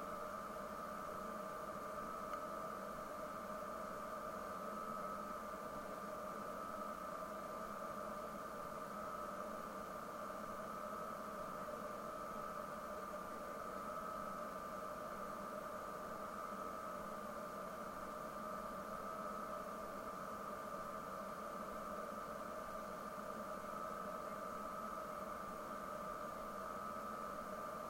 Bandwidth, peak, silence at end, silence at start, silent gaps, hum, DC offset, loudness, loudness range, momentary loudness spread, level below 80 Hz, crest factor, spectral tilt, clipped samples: 16.5 kHz; -34 dBFS; 0 s; 0 s; none; none; under 0.1%; -47 LUFS; 1 LU; 2 LU; -68 dBFS; 14 dB; -4.5 dB/octave; under 0.1%